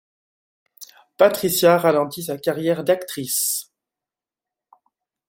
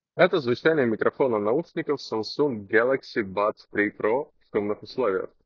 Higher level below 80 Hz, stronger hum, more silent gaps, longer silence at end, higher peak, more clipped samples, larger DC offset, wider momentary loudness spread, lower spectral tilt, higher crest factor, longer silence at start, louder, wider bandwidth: about the same, -66 dBFS vs -64 dBFS; neither; neither; first, 1.65 s vs 0.2 s; about the same, -2 dBFS vs -4 dBFS; neither; neither; about the same, 9 LU vs 7 LU; second, -3.5 dB/octave vs -6.5 dB/octave; about the same, 20 dB vs 20 dB; first, 0.8 s vs 0.15 s; first, -20 LUFS vs -25 LUFS; first, 17 kHz vs 7.2 kHz